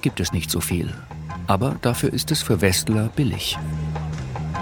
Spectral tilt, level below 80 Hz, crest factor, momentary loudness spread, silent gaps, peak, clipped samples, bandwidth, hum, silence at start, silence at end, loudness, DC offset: -4.5 dB/octave; -40 dBFS; 22 dB; 10 LU; none; -2 dBFS; under 0.1%; 18 kHz; none; 0 s; 0 s; -23 LUFS; under 0.1%